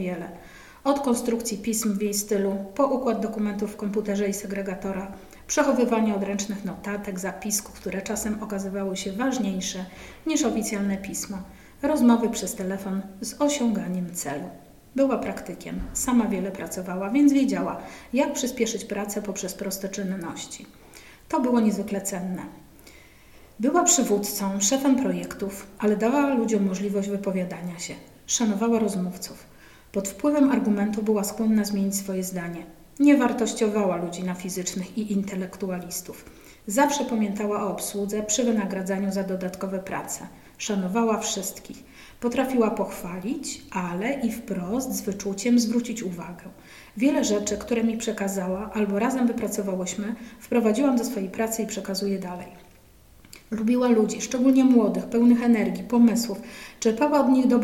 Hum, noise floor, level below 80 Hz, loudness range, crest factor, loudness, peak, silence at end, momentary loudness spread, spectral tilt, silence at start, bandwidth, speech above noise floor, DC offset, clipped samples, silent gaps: none; -53 dBFS; -54 dBFS; 5 LU; 20 dB; -25 LUFS; -6 dBFS; 0 s; 13 LU; -4.5 dB/octave; 0 s; 16.5 kHz; 28 dB; under 0.1%; under 0.1%; none